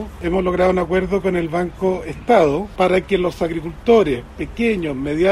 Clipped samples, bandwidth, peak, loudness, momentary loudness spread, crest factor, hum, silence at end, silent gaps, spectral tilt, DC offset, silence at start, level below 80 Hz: under 0.1%; 13.5 kHz; -2 dBFS; -18 LUFS; 8 LU; 16 dB; none; 0 s; none; -7 dB/octave; under 0.1%; 0 s; -36 dBFS